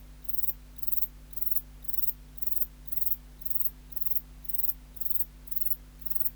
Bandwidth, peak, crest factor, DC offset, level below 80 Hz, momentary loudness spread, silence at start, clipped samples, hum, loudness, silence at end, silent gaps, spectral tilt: over 20 kHz; -10 dBFS; 22 dB; under 0.1%; -50 dBFS; 4 LU; 0 s; under 0.1%; none; -28 LUFS; 0 s; none; -3.5 dB/octave